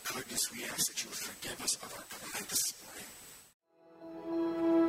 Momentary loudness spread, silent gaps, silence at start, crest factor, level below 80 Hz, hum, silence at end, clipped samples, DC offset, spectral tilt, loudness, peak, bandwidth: 17 LU; 3.54-3.60 s; 0 s; 18 dB; -70 dBFS; none; 0 s; under 0.1%; under 0.1%; -1.5 dB/octave; -35 LUFS; -18 dBFS; 16 kHz